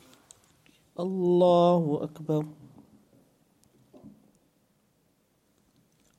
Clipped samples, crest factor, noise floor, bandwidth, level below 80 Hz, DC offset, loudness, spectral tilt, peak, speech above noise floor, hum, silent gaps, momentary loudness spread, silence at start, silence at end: under 0.1%; 20 dB; -69 dBFS; 9.4 kHz; -74 dBFS; under 0.1%; -25 LUFS; -8.5 dB/octave; -10 dBFS; 45 dB; none; none; 16 LU; 1 s; 2.1 s